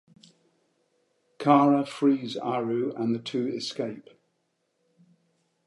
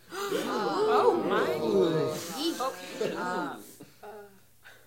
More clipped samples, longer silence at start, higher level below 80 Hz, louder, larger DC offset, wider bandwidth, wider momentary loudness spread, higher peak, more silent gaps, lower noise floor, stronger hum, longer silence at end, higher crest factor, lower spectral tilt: neither; first, 1.4 s vs 0.1 s; second, -80 dBFS vs -72 dBFS; first, -26 LUFS vs -29 LUFS; neither; second, 11.5 kHz vs 16.5 kHz; second, 12 LU vs 23 LU; first, -6 dBFS vs -10 dBFS; neither; first, -75 dBFS vs -56 dBFS; neither; first, 1.65 s vs 0.15 s; about the same, 22 dB vs 20 dB; first, -6.5 dB/octave vs -4.5 dB/octave